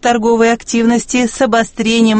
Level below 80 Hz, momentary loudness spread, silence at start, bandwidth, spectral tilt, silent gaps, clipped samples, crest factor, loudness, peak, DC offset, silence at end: -42 dBFS; 3 LU; 0.05 s; 8.8 kHz; -4 dB/octave; none; under 0.1%; 12 dB; -13 LUFS; 0 dBFS; under 0.1%; 0 s